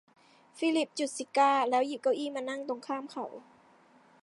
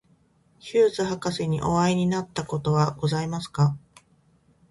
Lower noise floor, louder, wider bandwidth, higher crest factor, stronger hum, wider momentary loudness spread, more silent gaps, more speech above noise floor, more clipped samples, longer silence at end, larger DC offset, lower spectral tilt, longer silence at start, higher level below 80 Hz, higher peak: about the same, -61 dBFS vs -62 dBFS; second, -31 LUFS vs -25 LUFS; about the same, 11.5 kHz vs 11.5 kHz; about the same, 20 dB vs 16 dB; neither; first, 15 LU vs 8 LU; neither; second, 31 dB vs 38 dB; neither; about the same, 0.8 s vs 0.9 s; neither; second, -2.5 dB/octave vs -6.5 dB/octave; about the same, 0.55 s vs 0.65 s; second, -88 dBFS vs -54 dBFS; about the same, -12 dBFS vs -10 dBFS